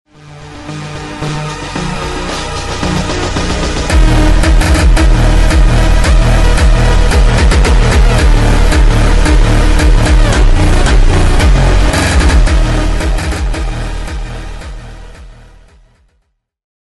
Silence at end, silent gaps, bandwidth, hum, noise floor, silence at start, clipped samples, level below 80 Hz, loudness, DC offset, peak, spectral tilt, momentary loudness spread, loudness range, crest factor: 1 s; none; 12 kHz; none; -61 dBFS; 0.15 s; under 0.1%; -10 dBFS; -11 LUFS; under 0.1%; 0 dBFS; -5 dB/octave; 13 LU; 9 LU; 8 dB